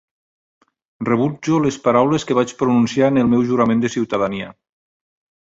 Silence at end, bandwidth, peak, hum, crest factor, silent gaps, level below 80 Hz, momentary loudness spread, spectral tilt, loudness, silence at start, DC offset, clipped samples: 0.9 s; 7.8 kHz; -2 dBFS; none; 16 dB; none; -54 dBFS; 6 LU; -6.5 dB/octave; -17 LUFS; 1 s; under 0.1%; under 0.1%